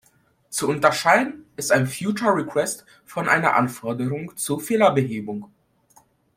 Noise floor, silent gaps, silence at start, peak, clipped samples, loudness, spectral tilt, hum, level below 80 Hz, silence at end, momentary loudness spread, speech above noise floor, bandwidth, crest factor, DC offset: -61 dBFS; none; 0.5 s; 0 dBFS; under 0.1%; -22 LUFS; -4.5 dB/octave; none; -64 dBFS; 0.9 s; 12 LU; 40 dB; 16.5 kHz; 22 dB; under 0.1%